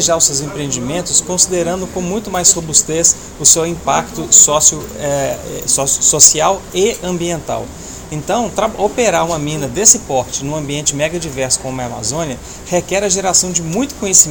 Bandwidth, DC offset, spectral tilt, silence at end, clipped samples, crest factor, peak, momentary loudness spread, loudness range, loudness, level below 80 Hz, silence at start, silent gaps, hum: over 20 kHz; under 0.1%; -2 dB/octave; 0 s; 0.5%; 14 dB; 0 dBFS; 13 LU; 6 LU; -13 LUFS; -38 dBFS; 0 s; none; none